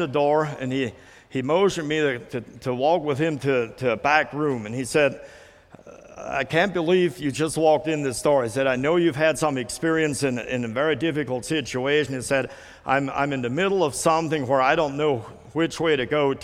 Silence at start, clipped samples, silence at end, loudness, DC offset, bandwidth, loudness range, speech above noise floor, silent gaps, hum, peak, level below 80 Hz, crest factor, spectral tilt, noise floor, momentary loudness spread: 0 s; under 0.1%; 0 s; -23 LUFS; under 0.1%; 15.5 kHz; 3 LU; 25 dB; none; none; -2 dBFS; -56 dBFS; 20 dB; -5 dB/octave; -48 dBFS; 7 LU